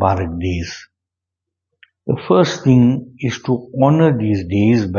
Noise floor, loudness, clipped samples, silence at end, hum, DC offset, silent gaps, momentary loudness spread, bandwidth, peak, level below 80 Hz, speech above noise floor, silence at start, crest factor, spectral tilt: -83 dBFS; -16 LUFS; under 0.1%; 0 s; none; under 0.1%; none; 12 LU; 7.2 kHz; 0 dBFS; -44 dBFS; 68 dB; 0 s; 16 dB; -7.5 dB/octave